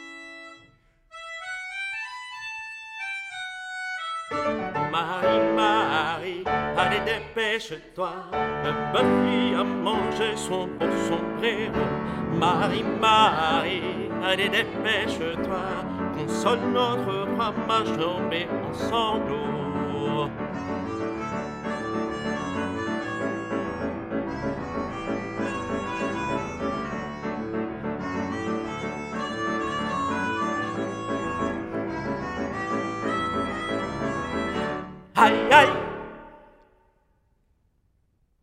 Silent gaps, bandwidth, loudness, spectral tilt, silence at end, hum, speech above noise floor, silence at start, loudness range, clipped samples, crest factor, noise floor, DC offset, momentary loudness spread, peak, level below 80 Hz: none; 16 kHz; -26 LUFS; -5 dB/octave; 2 s; none; 43 dB; 0 s; 7 LU; under 0.1%; 26 dB; -67 dBFS; under 0.1%; 10 LU; 0 dBFS; -52 dBFS